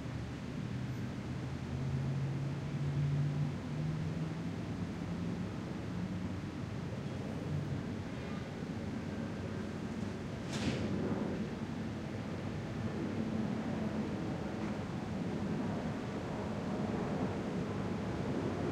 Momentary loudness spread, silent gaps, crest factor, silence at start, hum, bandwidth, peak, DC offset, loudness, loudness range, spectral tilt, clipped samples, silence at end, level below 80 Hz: 5 LU; none; 14 dB; 0 s; none; 11.5 kHz; -24 dBFS; under 0.1%; -39 LUFS; 3 LU; -7 dB/octave; under 0.1%; 0 s; -56 dBFS